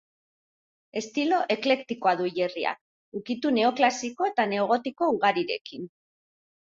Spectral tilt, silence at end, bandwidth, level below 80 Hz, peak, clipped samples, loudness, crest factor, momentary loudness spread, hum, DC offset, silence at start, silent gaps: -4 dB/octave; 0.9 s; 7.8 kHz; -74 dBFS; -8 dBFS; under 0.1%; -26 LUFS; 20 dB; 15 LU; none; under 0.1%; 0.95 s; 2.81-3.12 s, 5.61-5.65 s